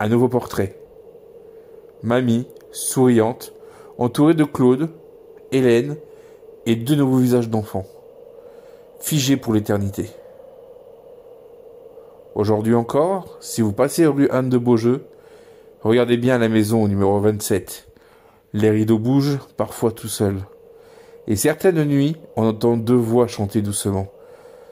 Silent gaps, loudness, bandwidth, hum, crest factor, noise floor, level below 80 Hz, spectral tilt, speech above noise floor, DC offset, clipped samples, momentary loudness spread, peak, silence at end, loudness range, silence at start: none; -19 LUFS; 16.5 kHz; none; 16 dB; -51 dBFS; -56 dBFS; -6 dB/octave; 33 dB; under 0.1%; under 0.1%; 13 LU; -4 dBFS; 0.35 s; 6 LU; 0 s